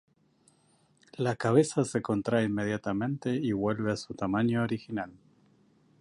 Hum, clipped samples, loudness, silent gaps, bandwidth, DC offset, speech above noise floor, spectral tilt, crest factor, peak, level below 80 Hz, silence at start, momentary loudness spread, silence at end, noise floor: none; under 0.1%; -30 LUFS; none; 11.5 kHz; under 0.1%; 38 dB; -6.5 dB/octave; 20 dB; -10 dBFS; -62 dBFS; 1.2 s; 9 LU; 0.85 s; -66 dBFS